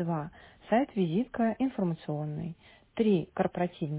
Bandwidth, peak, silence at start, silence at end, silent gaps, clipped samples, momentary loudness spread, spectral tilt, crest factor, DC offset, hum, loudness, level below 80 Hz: 4 kHz; -14 dBFS; 0 s; 0 s; none; under 0.1%; 13 LU; -7 dB/octave; 18 dB; under 0.1%; none; -31 LUFS; -62 dBFS